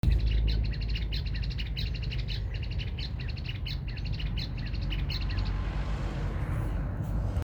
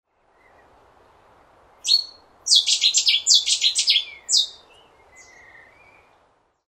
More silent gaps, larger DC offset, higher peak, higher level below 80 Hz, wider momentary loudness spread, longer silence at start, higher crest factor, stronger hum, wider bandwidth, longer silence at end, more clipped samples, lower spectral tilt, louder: neither; neither; second, -14 dBFS vs -2 dBFS; first, -32 dBFS vs -68 dBFS; second, 5 LU vs 13 LU; second, 0.05 s vs 1.85 s; about the same, 18 dB vs 22 dB; neither; second, 7 kHz vs 16 kHz; second, 0 s vs 2.15 s; neither; first, -6.5 dB/octave vs 5 dB/octave; second, -33 LUFS vs -17 LUFS